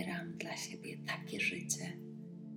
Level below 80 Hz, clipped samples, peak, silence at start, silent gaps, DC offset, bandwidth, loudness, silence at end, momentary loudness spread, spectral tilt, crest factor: -80 dBFS; under 0.1%; -20 dBFS; 0 s; none; under 0.1%; 17.5 kHz; -40 LUFS; 0 s; 12 LU; -3 dB/octave; 22 dB